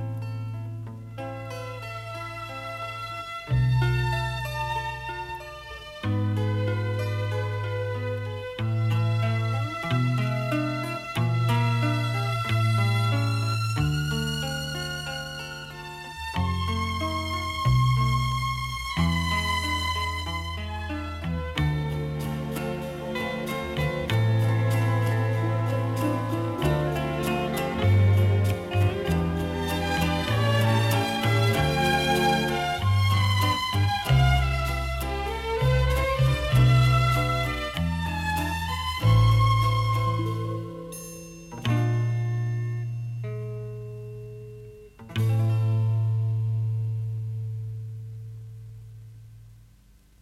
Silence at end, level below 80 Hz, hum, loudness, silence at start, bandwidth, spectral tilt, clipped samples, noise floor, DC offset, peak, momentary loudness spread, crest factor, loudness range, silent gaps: 0.65 s; -38 dBFS; none; -26 LUFS; 0 s; 15.5 kHz; -6 dB/octave; under 0.1%; -55 dBFS; under 0.1%; -8 dBFS; 13 LU; 16 dB; 7 LU; none